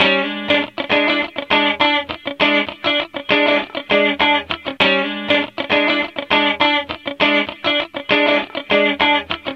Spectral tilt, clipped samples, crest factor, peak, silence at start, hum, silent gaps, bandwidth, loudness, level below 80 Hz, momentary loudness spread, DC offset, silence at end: -5 dB/octave; under 0.1%; 16 dB; 0 dBFS; 0 s; none; none; 7.8 kHz; -16 LUFS; -52 dBFS; 5 LU; under 0.1%; 0 s